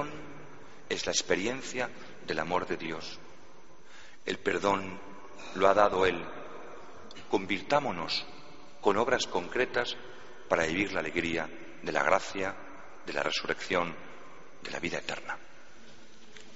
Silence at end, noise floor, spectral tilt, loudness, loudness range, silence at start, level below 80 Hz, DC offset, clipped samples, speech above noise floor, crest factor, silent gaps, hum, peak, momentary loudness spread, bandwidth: 0 s; -56 dBFS; -2 dB/octave; -31 LUFS; 5 LU; 0 s; -60 dBFS; 0.8%; under 0.1%; 25 dB; 26 dB; none; none; -8 dBFS; 21 LU; 8 kHz